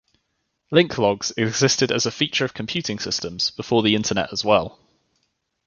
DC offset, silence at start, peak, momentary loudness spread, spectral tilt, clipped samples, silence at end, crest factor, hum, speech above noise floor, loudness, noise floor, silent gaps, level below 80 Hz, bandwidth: under 0.1%; 0.7 s; -2 dBFS; 7 LU; -3.5 dB/octave; under 0.1%; 1 s; 20 dB; none; 53 dB; -21 LUFS; -74 dBFS; none; -54 dBFS; 10 kHz